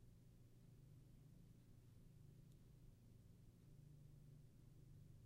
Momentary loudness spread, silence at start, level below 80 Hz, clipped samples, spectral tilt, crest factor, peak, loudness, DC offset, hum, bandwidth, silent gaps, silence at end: 3 LU; 0 s; -72 dBFS; under 0.1%; -7 dB/octave; 12 dB; -54 dBFS; -68 LUFS; under 0.1%; none; 15.5 kHz; none; 0 s